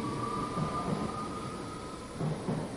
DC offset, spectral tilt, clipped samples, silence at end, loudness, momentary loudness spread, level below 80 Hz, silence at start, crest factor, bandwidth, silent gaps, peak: under 0.1%; -6 dB/octave; under 0.1%; 0 s; -36 LUFS; 7 LU; -54 dBFS; 0 s; 16 dB; 11.5 kHz; none; -20 dBFS